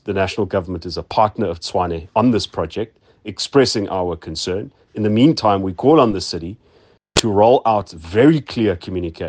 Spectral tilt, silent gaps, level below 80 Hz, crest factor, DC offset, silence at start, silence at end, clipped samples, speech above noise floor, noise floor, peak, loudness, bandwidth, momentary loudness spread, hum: -5.5 dB/octave; none; -46 dBFS; 18 dB; under 0.1%; 0.05 s; 0 s; under 0.1%; 35 dB; -52 dBFS; 0 dBFS; -18 LUFS; 9.8 kHz; 13 LU; none